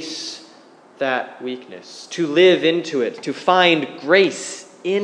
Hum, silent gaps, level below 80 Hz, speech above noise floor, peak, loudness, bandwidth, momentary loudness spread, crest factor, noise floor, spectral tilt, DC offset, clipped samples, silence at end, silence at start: none; none; -84 dBFS; 29 dB; 0 dBFS; -18 LUFS; 10.5 kHz; 17 LU; 20 dB; -47 dBFS; -4 dB/octave; under 0.1%; under 0.1%; 0 s; 0 s